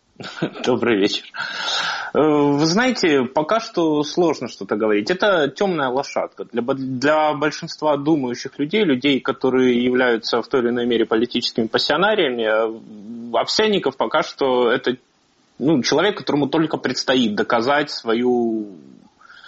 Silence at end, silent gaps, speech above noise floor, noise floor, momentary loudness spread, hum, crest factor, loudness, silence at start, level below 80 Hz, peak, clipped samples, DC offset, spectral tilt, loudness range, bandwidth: 0.7 s; none; 40 dB; -59 dBFS; 9 LU; none; 16 dB; -19 LUFS; 0.2 s; -60 dBFS; -2 dBFS; under 0.1%; under 0.1%; -3 dB/octave; 2 LU; 8 kHz